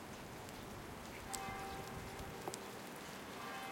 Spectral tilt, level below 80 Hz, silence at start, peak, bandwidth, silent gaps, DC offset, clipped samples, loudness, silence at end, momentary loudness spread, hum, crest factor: -3.5 dB/octave; -64 dBFS; 0 s; -20 dBFS; 17 kHz; none; under 0.1%; under 0.1%; -48 LUFS; 0 s; 5 LU; none; 28 dB